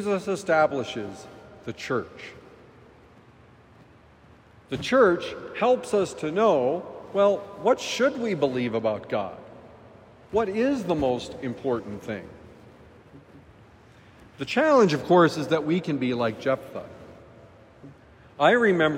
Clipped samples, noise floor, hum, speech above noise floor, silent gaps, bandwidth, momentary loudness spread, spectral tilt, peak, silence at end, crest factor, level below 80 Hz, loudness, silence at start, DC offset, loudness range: under 0.1%; -53 dBFS; none; 29 dB; none; 15.5 kHz; 19 LU; -5.5 dB/octave; -6 dBFS; 0 s; 20 dB; -60 dBFS; -24 LUFS; 0 s; under 0.1%; 12 LU